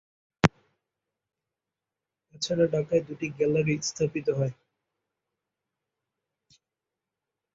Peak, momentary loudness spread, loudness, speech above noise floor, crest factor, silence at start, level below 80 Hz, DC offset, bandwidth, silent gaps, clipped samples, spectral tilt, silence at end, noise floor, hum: 0 dBFS; 6 LU; -27 LUFS; 62 dB; 30 dB; 0.45 s; -58 dBFS; under 0.1%; 8 kHz; none; under 0.1%; -5.5 dB/octave; 3.05 s; -89 dBFS; none